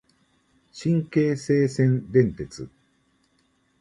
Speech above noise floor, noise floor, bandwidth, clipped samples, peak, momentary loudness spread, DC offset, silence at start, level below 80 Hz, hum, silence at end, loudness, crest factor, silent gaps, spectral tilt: 44 dB; -67 dBFS; 11 kHz; under 0.1%; -6 dBFS; 16 LU; under 0.1%; 0.75 s; -54 dBFS; none; 1.15 s; -23 LUFS; 20 dB; none; -8 dB/octave